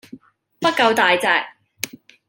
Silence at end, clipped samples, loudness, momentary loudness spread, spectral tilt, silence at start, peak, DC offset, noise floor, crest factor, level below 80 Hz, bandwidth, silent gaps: 0.4 s; under 0.1%; -17 LUFS; 15 LU; -2.5 dB/octave; 0.15 s; 0 dBFS; under 0.1%; -44 dBFS; 20 dB; -70 dBFS; 17 kHz; none